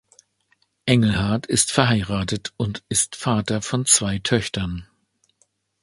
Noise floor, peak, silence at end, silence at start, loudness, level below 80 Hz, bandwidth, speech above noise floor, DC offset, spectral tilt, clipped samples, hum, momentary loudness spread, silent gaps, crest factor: -67 dBFS; 0 dBFS; 1 s; 0.85 s; -21 LUFS; -44 dBFS; 12 kHz; 46 dB; under 0.1%; -4 dB/octave; under 0.1%; none; 11 LU; none; 22 dB